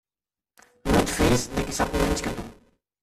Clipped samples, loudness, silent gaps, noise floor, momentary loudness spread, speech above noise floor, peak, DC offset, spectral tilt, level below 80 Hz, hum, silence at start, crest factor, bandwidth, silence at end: under 0.1%; -24 LUFS; none; under -90 dBFS; 13 LU; over 64 dB; -8 dBFS; under 0.1%; -4.5 dB/octave; -36 dBFS; none; 0.85 s; 18 dB; 16 kHz; 0.5 s